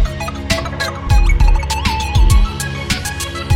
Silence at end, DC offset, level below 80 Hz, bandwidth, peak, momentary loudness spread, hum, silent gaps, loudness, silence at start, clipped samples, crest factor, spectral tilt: 0 s; under 0.1%; -16 dBFS; 15.5 kHz; 0 dBFS; 8 LU; none; none; -17 LUFS; 0 s; under 0.1%; 14 dB; -4.5 dB/octave